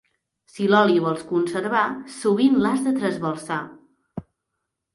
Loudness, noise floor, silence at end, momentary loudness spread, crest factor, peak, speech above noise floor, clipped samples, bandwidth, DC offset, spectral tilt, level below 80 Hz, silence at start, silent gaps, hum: -21 LUFS; -80 dBFS; 0.75 s; 21 LU; 18 dB; -4 dBFS; 59 dB; under 0.1%; 11.5 kHz; under 0.1%; -6 dB/octave; -62 dBFS; 0.55 s; none; none